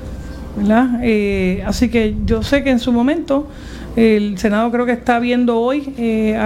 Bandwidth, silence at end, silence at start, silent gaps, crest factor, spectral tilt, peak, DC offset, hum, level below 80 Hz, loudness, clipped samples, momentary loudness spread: 14.5 kHz; 0 s; 0 s; none; 14 dB; -6.5 dB/octave; 0 dBFS; under 0.1%; none; -32 dBFS; -16 LUFS; under 0.1%; 7 LU